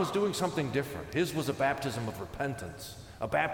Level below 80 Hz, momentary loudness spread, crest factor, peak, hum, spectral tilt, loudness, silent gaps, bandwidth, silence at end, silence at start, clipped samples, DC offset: -56 dBFS; 10 LU; 18 dB; -14 dBFS; none; -5 dB/octave; -33 LUFS; none; 18.5 kHz; 0 s; 0 s; under 0.1%; under 0.1%